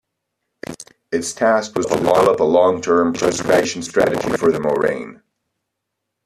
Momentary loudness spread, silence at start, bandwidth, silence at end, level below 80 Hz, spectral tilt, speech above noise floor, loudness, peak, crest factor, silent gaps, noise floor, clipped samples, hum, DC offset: 19 LU; 0.7 s; 14 kHz; 1.1 s; -52 dBFS; -4.5 dB/octave; 61 dB; -17 LUFS; -2 dBFS; 16 dB; none; -78 dBFS; under 0.1%; none; under 0.1%